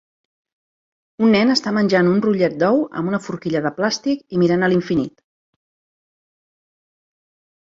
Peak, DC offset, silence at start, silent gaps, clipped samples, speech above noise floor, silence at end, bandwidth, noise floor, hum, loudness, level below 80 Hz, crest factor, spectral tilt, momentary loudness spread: -2 dBFS; under 0.1%; 1.2 s; none; under 0.1%; over 73 dB; 2.6 s; 7.8 kHz; under -90 dBFS; none; -18 LUFS; -60 dBFS; 18 dB; -6 dB/octave; 8 LU